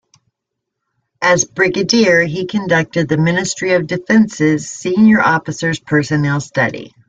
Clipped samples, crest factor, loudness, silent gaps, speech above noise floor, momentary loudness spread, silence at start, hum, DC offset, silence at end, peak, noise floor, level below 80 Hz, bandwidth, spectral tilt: under 0.1%; 14 dB; -14 LUFS; none; 63 dB; 7 LU; 1.2 s; none; under 0.1%; 0.2 s; 0 dBFS; -78 dBFS; -52 dBFS; 9.2 kHz; -5 dB/octave